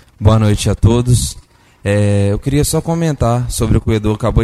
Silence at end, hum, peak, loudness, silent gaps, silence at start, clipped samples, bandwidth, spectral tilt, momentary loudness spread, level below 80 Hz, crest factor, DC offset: 0 s; none; -2 dBFS; -14 LUFS; none; 0.2 s; under 0.1%; 14 kHz; -6 dB/octave; 5 LU; -24 dBFS; 12 dB; under 0.1%